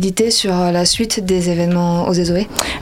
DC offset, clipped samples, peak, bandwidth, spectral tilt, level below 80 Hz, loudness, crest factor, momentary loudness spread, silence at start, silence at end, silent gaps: under 0.1%; under 0.1%; 0 dBFS; 16.5 kHz; -4.5 dB/octave; -38 dBFS; -15 LUFS; 16 dB; 3 LU; 0 s; 0 s; none